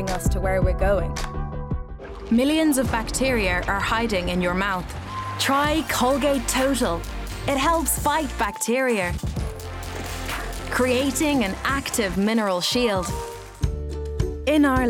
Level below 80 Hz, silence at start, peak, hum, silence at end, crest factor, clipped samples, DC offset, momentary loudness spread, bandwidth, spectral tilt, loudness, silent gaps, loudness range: -32 dBFS; 0 s; -10 dBFS; none; 0 s; 14 dB; under 0.1%; under 0.1%; 11 LU; 18 kHz; -4.5 dB/octave; -23 LUFS; none; 2 LU